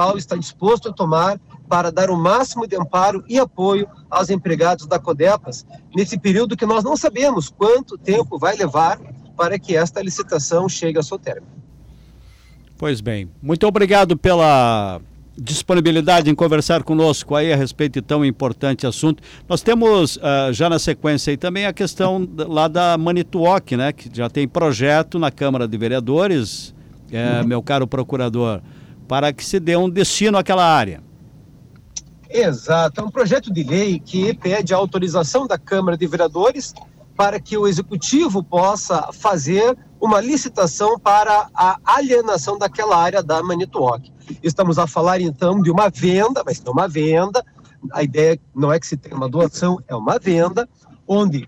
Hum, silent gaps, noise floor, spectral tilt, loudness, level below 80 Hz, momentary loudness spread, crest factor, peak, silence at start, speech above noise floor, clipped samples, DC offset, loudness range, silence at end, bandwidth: none; none; -45 dBFS; -5.5 dB/octave; -18 LUFS; -46 dBFS; 9 LU; 12 dB; -6 dBFS; 0 s; 28 dB; under 0.1%; under 0.1%; 4 LU; 0 s; 15.5 kHz